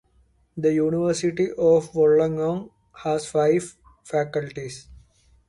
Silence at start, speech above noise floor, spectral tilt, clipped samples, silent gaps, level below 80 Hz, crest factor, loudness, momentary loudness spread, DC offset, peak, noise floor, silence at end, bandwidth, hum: 0.55 s; 40 dB; -6 dB/octave; under 0.1%; none; -56 dBFS; 14 dB; -23 LUFS; 16 LU; under 0.1%; -8 dBFS; -61 dBFS; 0.55 s; 11.5 kHz; none